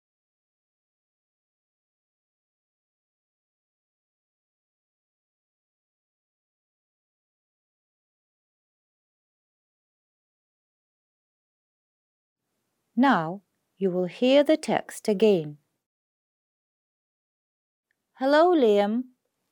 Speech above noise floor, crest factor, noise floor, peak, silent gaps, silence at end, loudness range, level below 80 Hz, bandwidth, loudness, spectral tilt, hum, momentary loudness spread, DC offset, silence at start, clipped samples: 57 dB; 22 dB; -79 dBFS; -8 dBFS; 15.86-17.83 s; 0.5 s; 6 LU; -84 dBFS; 16 kHz; -23 LUFS; -6 dB/octave; none; 14 LU; under 0.1%; 12.95 s; under 0.1%